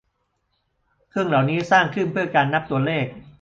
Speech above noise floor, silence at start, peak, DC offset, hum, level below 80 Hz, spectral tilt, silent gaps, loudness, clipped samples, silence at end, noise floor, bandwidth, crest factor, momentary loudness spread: 51 dB; 1.15 s; -4 dBFS; under 0.1%; none; -58 dBFS; -6.5 dB/octave; none; -21 LUFS; under 0.1%; 0.15 s; -72 dBFS; 7.6 kHz; 20 dB; 8 LU